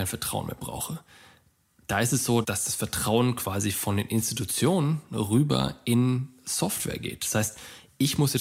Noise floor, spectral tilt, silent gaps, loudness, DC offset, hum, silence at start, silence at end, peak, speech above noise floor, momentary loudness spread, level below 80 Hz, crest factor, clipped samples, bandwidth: -63 dBFS; -4.5 dB/octave; none; -27 LUFS; under 0.1%; none; 0 s; 0 s; -10 dBFS; 36 dB; 9 LU; -54 dBFS; 18 dB; under 0.1%; 16 kHz